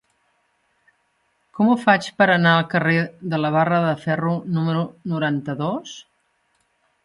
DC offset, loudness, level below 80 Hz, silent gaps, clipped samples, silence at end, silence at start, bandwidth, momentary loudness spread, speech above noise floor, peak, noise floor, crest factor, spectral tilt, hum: under 0.1%; -20 LUFS; -64 dBFS; none; under 0.1%; 1.05 s; 1.55 s; 11 kHz; 10 LU; 48 dB; -2 dBFS; -67 dBFS; 20 dB; -6.5 dB/octave; none